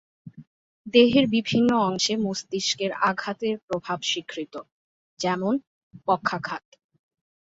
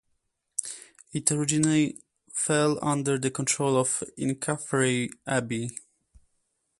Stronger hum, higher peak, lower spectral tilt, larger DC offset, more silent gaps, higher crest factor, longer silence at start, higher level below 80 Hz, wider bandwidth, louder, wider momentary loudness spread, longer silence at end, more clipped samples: neither; about the same, -4 dBFS vs -6 dBFS; about the same, -4 dB/octave vs -4 dB/octave; neither; first, 0.47-0.84 s, 3.62-3.68 s, 4.72-5.17 s, 5.67-5.91 s vs none; about the same, 22 dB vs 22 dB; second, 0.25 s vs 0.6 s; about the same, -64 dBFS vs -64 dBFS; second, 8 kHz vs 12 kHz; first, -24 LUFS vs -27 LUFS; first, 15 LU vs 12 LU; about the same, 1 s vs 1 s; neither